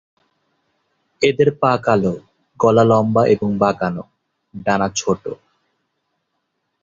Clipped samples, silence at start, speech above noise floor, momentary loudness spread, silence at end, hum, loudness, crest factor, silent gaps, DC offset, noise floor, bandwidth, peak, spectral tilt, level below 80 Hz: under 0.1%; 1.2 s; 56 dB; 12 LU; 1.5 s; none; -17 LUFS; 18 dB; none; under 0.1%; -73 dBFS; 7.8 kHz; -2 dBFS; -6 dB/octave; -52 dBFS